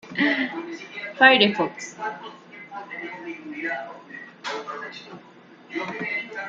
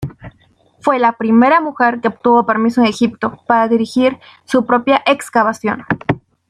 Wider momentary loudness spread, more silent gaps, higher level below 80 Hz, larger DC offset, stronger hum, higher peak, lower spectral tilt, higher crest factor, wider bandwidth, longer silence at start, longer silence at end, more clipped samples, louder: first, 23 LU vs 8 LU; neither; second, -74 dBFS vs -50 dBFS; neither; neither; about the same, -2 dBFS vs 0 dBFS; second, -4 dB/octave vs -6 dB/octave; first, 24 dB vs 14 dB; second, 8 kHz vs 12 kHz; about the same, 0.05 s vs 0 s; second, 0 s vs 0.35 s; neither; second, -23 LUFS vs -14 LUFS